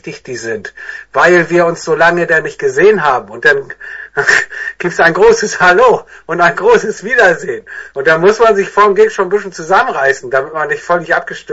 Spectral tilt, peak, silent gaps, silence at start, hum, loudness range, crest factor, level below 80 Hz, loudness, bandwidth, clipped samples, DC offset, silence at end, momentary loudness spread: -4 dB/octave; 0 dBFS; none; 0.05 s; none; 1 LU; 12 dB; -46 dBFS; -11 LUFS; 8 kHz; 0.1%; under 0.1%; 0 s; 13 LU